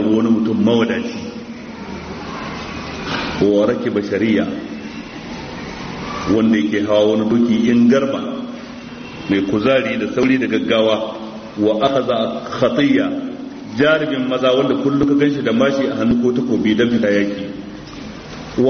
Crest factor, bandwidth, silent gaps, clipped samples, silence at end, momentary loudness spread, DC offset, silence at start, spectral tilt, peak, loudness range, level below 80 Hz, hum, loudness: 14 dB; 6.6 kHz; none; under 0.1%; 0 s; 15 LU; under 0.1%; 0 s; -4.5 dB/octave; -2 dBFS; 4 LU; -46 dBFS; none; -17 LUFS